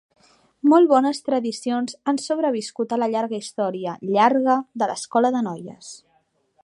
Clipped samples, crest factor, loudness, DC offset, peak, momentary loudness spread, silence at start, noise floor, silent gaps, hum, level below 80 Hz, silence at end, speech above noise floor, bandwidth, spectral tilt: under 0.1%; 18 dB; -21 LUFS; under 0.1%; -2 dBFS; 12 LU; 0.65 s; -65 dBFS; none; none; -76 dBFS; 0.7 s; 45 dB; 11.5 kHz; -5 dB/octave